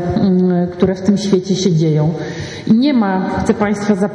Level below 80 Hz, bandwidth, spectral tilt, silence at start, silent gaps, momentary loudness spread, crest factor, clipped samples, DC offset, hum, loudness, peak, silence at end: -42 dBFS; 10 kHz; -7 dB/octave; 0 s; none; 4 LU; 14 dB; under 0.1%; under 0.1%; none; -15 LUFS; 0 dBFS; 0 s